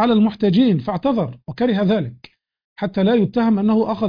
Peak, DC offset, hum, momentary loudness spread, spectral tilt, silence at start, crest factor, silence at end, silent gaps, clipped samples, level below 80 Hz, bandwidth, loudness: -6 dBFS; under 0.1%; none; 9 LU; -9.5 dB/octave; 0 s; 12 dB; 0 s; 2.64-2.76 s; under 0.1%; -52 dBFS; 5.2 kHz; -18 LUFS